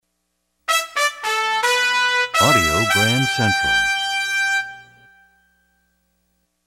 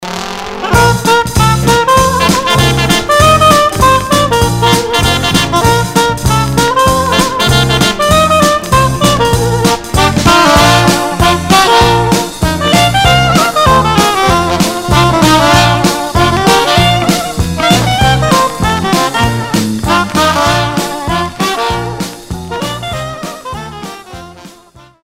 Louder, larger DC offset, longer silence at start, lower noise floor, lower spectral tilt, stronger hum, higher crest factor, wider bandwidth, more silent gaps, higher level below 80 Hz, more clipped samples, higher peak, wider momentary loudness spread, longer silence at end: second, -17 LUFS vs -9 LUFS; second, under 0.1% vs 0.4%; first, 0.7 s vs 0 s; first, -72 dBFS vs -40 dBFS; second, -2.5 dB/octave vs -4 dB/octave; first, 60 Hz at -50 dBFS vs none; first, 18 dB vs 10 dB; about the same, 16 kHz vs 16.5 kHz; neither; second, -46 dBFS vs -24 dBFS; second, under 0.1% vs 0.3%; about the same, -2 dBFS vs 0 dBFS; second, 6 LU vs 12 LU; first, 1.85 s vs 0.55 s